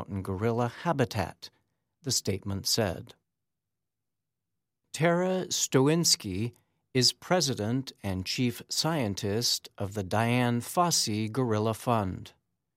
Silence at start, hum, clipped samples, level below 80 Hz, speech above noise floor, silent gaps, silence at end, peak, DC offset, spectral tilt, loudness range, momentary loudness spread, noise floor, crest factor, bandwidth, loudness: 0 s; none; under 0.1%; -64 dBFS; 60 dB; none; 0.45 s; -10 dBFS; under 0.1%; -4 dB/octave; 6 LU; 11 LU; -89 dBFS; 20 dB; 16 kHz; -28 LUFS